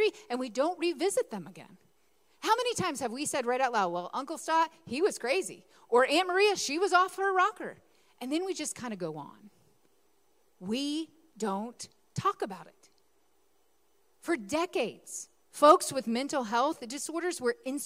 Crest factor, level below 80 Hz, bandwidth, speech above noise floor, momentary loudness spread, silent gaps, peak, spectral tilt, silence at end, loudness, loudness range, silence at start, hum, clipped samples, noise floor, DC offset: 24 dB; -74 dBFS; 16 kHz; 42 dB; 16 LU; none; -6 dBFS; -3 dB/octave; 0 s; -30 LUFS; 10 LU; 0 s; none; under 0.1%; -72 dBFS; under 0.1%